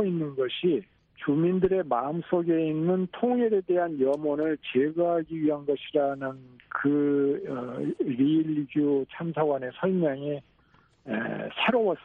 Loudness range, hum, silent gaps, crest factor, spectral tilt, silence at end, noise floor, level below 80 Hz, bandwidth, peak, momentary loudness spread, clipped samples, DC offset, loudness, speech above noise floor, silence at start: 2 LU; none; none; 16 dB; -9 dB/octave; 0.05 s; -62 dBFS; -64 dBFS; 4.1 kHz; -12 dBFS; 8 LU; under 0.1%; under 0.1%; -27 LUFS; 36 dB; 0 s